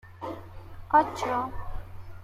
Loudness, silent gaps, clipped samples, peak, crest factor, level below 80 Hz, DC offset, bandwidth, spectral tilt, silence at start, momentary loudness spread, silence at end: -27 LUFS; none; under 0.1%; -10 dBFS; 20 dB; -44 dBFS; under 0.1%; 15.5 kHz; -5.5 dB/octave; 0.05 s; 23 LU; 0 s